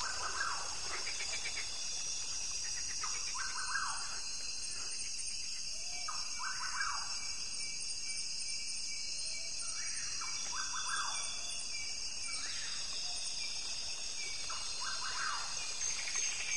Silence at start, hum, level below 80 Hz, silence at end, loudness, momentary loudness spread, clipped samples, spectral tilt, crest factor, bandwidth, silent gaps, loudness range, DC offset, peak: 0 s; none; -62 dBFS; 0 s; -37 LUFS; 3 LU; under 0.1%; 1.5 dB/octave; 18 dB; 12 kHz; none; 1 LU; 0.7%; -22 dBFS